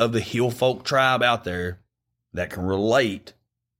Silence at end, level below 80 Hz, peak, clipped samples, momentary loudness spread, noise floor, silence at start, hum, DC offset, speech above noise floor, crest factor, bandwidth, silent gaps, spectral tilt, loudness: 0.5 s; -54 dBFS; -6 dBFS; under 0.1%; 12 LU; -76 dBFS; 0 s; none; under 0.1%; 54 dB; 18 dB; 16.5 kHz; none; -5 dB/octave; -23 LUFS